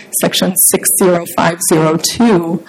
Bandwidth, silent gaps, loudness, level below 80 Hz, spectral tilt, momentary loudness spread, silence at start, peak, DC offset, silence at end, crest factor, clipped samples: 17 kHz; none; -11 LUFS; -48 dBFS; -3.5 dB/octave; 4 LU; 0 s; 0 dBFS; under 0.1%; 0.05 s; 12 dB; under 0.1%